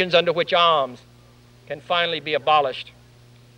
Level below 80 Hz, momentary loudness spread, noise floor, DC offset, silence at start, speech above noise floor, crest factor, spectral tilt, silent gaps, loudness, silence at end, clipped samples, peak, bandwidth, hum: -62 dBFS; 18 LU; -50 dBFS; under 0.1%; 0 s; 30 dB; 18 dB; -4.5 dB/octave; none; -20 LUFS; 0.75 s; under 0.1%; -4 dBFS; 9.8 kHz; none